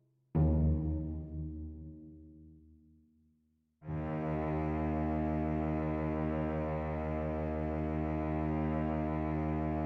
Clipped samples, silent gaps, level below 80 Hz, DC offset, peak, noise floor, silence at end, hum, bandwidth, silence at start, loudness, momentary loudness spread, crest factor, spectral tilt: under 0.1%; none; -42 dBFS; under 0.1%; -20 dBFS; -75 dBFS; 0 s; none; 4.4 kHz; 0.35 s; -35 LUFS; 11 LU; 14 dB; -11 dB/octave